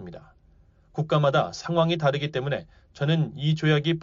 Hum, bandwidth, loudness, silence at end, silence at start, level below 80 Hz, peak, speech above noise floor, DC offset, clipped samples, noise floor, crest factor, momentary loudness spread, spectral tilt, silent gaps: none; 7.4 kHz; -25 LUFS; 0 s; 0 s; -56 dBFS; -10 dBFS; 33 dB; under 0.1%; under 0.1%; -57 dBFS; 16 dB; 11 LU; -5.5 dB/octave; none